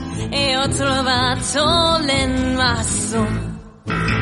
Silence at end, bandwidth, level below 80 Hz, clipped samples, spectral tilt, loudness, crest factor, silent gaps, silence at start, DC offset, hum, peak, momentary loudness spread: 0 s; 11.5 kHz; -32 dBFS; under 0.1%; -3.5 dB/octave; -18 LUFS; 16 dB; none; 0 s; under 0.1%; none; -2 dBFS; 8 LU